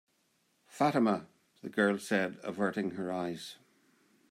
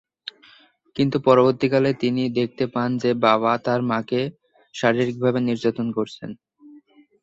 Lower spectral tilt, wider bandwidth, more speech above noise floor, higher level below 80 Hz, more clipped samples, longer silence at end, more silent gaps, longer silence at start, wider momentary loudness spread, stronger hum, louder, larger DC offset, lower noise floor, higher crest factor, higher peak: second, -5.5 dB/octave vs -7 dB/octave; first, 15.5 kHz vs 7.8 kHz; first, 42 dB vs 33 dB; second, -80 dBFS vs -62 dBFS; neither; first, 0.75 s vs 0.45 s; neither; second, 0.75 s vs 0.95 s; second, 11 LU vs 19 LU; neither; second, -33 LUFS vs -21 LUFS; neither; first, -74 dBFS vs -54 dBFS; about the same, 20 dB vs 20 dB; second, -16 dBFS vs -2 dBFS